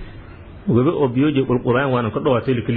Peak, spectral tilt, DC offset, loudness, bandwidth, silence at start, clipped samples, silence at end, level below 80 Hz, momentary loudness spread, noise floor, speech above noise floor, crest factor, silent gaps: -4 dBFS; -12 dB/octave; under 0.1%; -18 LUFS; 4.5 kHz; 0 s; under 0.1%; 0 s; -44 dBFS; 3 LU; -38 dBFS; 20 dB; 14 dB; none